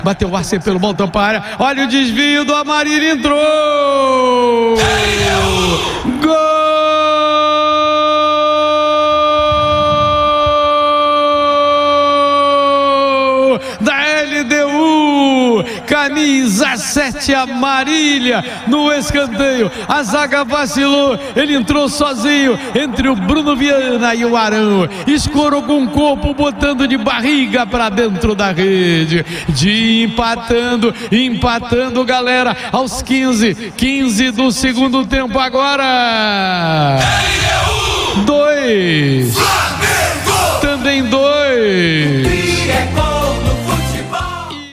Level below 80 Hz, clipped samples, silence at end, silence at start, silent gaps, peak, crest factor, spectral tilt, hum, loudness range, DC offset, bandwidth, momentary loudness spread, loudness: -32 dBFS; under 0.1%; 0 s; 0 s; none; 0 dBFS; 12 dB; -4.5 dB/octave; none; 2 LU; under 0.1%; 15.5 kHz; 4 LU; -12 LUFS